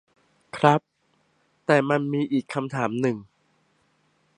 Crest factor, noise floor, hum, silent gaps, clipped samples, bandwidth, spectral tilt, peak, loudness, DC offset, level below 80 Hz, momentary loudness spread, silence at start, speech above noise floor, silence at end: 24 dB; -68 dBFS; none; none; under 0.1%; 10.5 kHz; -7 dB/octave; -2 dBFS; -24 LUFS; under 0.1%; -70 dBFS; 11 LU; 0.55 s; 45 dB; 1.15 s